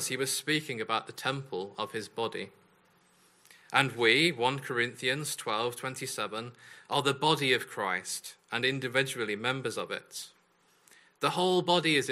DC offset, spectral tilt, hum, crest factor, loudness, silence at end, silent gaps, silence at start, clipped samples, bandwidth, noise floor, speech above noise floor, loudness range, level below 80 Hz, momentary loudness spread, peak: under 0.1%; -3.5 dB/octave; none; 26 dB; -30 LUFS; 0 s; none; 0 s; under 0.1%; 15.5 kHz; -67 dBFS; 36 dB; 5 LU; -76 dBFS; 12 LU; -6 dBFS